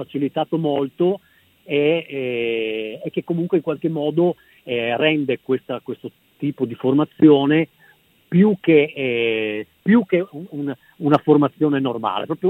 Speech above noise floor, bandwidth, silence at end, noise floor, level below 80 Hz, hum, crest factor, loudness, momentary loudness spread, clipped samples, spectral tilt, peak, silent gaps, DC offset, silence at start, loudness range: 35 dB; 4.2 kHz; 0 s; -55 dBFS; -66 dBFS; none; 18 dB; -20 LUFS; 13 LU; under 0.1%; -9 dB/octave; 0 dBFS; none; under 0.1%; 0 s; 5 LU